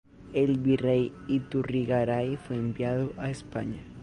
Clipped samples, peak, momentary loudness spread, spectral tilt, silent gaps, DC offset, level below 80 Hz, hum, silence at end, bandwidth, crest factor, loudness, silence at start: under 0.1%; -14 dBFS; 10 LU; -8 dB/octave; none; under 0.1%; -54 dBFS; none; 0 s; 10.5 kHz; 16 dB; -29 LUFS; 0.2 s